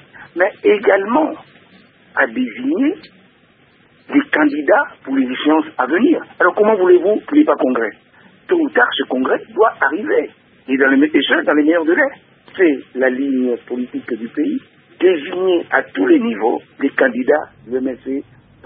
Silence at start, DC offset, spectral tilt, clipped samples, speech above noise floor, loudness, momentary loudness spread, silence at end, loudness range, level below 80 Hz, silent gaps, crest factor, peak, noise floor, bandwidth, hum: 0.15 s; under 0.1%; -8.5 dB/octave; under 0.1%; 36 dB; -16 LUFS; 10 LU; 0.45 s; 4 LU; -64 dBFS; none; 16 dB; 0 dBFS; -52 dBFS; 4.5 kHz; none